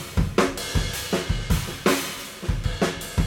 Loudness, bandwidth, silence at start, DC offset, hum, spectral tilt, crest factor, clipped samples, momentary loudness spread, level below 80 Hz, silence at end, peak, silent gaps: -25 LUFS; 18 kHz; 0 s; under 0.1%; none; -4.5 dB/octave; 20 dB; under 0.1%; 6 LU; -32 dBFS; 0 s; -6 dBFS; none